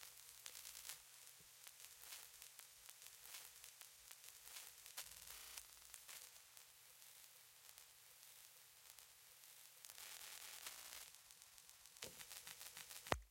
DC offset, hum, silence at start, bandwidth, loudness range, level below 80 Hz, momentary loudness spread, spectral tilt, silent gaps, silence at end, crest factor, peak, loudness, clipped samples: under 0.1%; none; 0 s; 17 kHz; 5 LU; -74 dBFS; 9 LU; -1 dB/octave; none; 0 s; 40 dB; -18 dBFS; -56 LUFS; under 0.1%